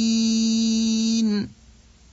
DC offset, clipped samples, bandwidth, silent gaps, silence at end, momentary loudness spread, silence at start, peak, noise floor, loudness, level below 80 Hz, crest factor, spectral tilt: under 0.1%; under 0.1%; 8 kHz; none; 0.6 s; 6 LU; 0 s; -12 dBFS; -51 dBFS; -21 LUFS; -54 dBFS; 10 dB; -4 dB/octave